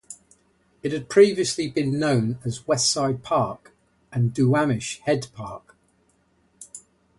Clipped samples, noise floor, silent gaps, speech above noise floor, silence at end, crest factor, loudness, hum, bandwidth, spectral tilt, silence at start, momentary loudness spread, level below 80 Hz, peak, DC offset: under 0.1%; -64 dBFS; none; 42 dB; 0.4 s; 20 dB; -23 LUFS; none; 11.5 kHz; -5 dB/octave; 0.1 s; 23 LU; -58 dBFS; -4 dBFS; under 0.1%